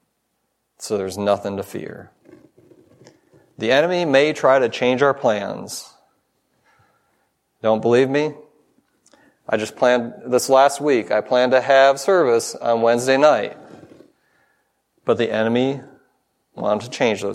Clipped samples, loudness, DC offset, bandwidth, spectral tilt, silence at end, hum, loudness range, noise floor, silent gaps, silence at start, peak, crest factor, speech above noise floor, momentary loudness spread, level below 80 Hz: under 0.1%; -18 LUFS; under 0.1%; 15.5 kHz; -4.5 dB/octave; 0 s; none; 8 LU; -72 dBFS; none; 0.8 s; 0 dBFS; 20 dB; 54 dB; 14 LU; -70 dBFS